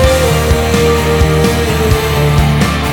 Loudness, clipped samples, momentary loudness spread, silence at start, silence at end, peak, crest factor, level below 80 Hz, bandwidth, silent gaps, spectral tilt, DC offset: -11 LUFS; under 0.1%; 1 LU; 0 s; 0 s; 0 dBFS; 10 dB; -18 dBFS; 18 kHz; none; -5.5 dB/octave; under 0.1%